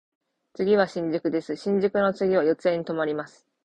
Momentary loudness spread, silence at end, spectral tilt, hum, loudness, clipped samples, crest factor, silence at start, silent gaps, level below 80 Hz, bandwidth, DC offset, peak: 7 LU; 0.4 s; -7 dB/octave; none; -25 LUFS; under 0.1%; 18 dB; 0.6 s; none; -64 dBFS; 9 kHz; under 0.1%; -8 dBFS